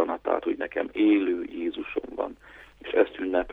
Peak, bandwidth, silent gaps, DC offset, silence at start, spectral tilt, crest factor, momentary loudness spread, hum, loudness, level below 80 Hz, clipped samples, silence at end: -8 dBFS; 4 kHz; none; under 0.1%; 0 s; -7 dB/octave; 20 dB; 12 LU; none; -27 LUFS; -58 dBFS; under 0.1%; 0 s